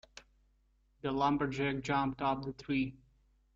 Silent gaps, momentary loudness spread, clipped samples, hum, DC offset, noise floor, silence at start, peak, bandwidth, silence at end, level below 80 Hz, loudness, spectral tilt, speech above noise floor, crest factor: none; 7 LU; under 0.1%; none; under 0.1%; -71 dBFS; 0.15 s; -16 dBFS; 7.6 kHz; 0.6 s; -60 dBFS; -34 LUFS; -6.5 dB/octave; 38 dB; 20 dB